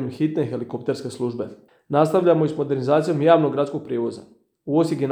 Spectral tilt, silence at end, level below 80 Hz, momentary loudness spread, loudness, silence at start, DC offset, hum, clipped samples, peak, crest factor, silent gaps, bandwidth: -7.5 dB/octave; 0 s; -70 dBFS; 12 LU; -21 LUFS; 0 s; under 0.1%; none; under 0.1%; -2 dBFS; 18 dB; none; 12.5 kHz